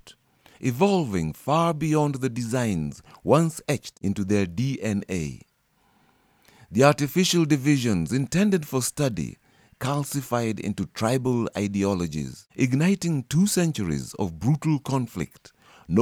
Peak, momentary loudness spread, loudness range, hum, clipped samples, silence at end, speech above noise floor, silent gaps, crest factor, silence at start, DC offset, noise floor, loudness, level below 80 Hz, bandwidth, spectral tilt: -4 dBFS; 9 LU; 4 LU; none; under 0.1%; 0 s; 41 dB; none; 20 dB; 0.05 s; under 0.1%; -65 dBFS; -25 LUFS; -52 dBFS; 17.5 kHz; -5.5 dB/octave